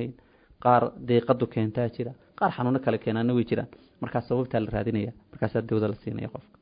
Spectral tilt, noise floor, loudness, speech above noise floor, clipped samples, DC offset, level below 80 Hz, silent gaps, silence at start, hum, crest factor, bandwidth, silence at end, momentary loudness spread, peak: -12 dB/octave; -56 dBFS; -27 LUFS; 30 dB; under 0.1%; under 0.1%; -54 dBFS; none; 0 s; none; 20 dB; 5.2 kHz; 0.2 s; 13 LU; -6 dBFS